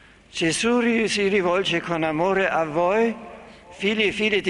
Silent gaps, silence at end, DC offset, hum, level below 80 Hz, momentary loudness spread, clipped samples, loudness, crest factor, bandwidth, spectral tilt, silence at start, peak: none; 0 s; under 0.1%; none; -54 dBFS; 6 LU; under 0.1%; -21 LUFS; 14 dB; 11.5 kHz; -4 dB/octave; 0.35 s; -8 dBFS